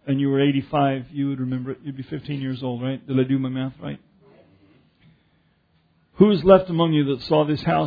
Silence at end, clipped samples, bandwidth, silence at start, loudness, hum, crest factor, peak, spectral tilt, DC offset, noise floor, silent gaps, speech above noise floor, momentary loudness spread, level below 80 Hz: 0 s; under 0.1%; 5 kHz; 0.05 s; -21 LUFS; none; 22 dB; 0 dBFS; -10 dB/octave; under 0.1%; -63 dBFS; none; 42 dB; 16 LU; -52 dBFS